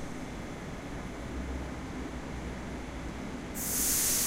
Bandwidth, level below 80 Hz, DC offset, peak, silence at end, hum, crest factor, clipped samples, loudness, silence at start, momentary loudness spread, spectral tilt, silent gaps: 16 kHz; -44 dBFS; under 0.1%; -16 dBFS; 0 s; none; 18 dB; under 0.1%; -35 LUFS; 0 s; 14 LU; -2.5 dB/octave; none